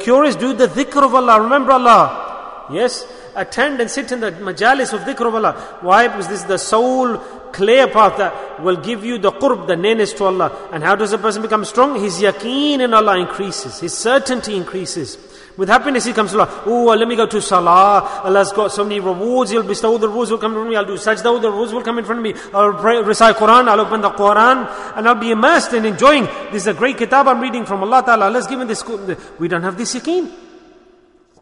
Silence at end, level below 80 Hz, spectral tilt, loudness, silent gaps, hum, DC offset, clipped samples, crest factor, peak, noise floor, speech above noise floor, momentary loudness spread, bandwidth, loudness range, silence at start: 0.85 s; -50 dBFS; -4 dB/octave; -15 LUFS; none; none; under 0.1%; under 0.1%; 14 dB; 0 dBFS; -50 dBFS; 36 dB; 12 LU; 11 kHz; 5 LU; 0 s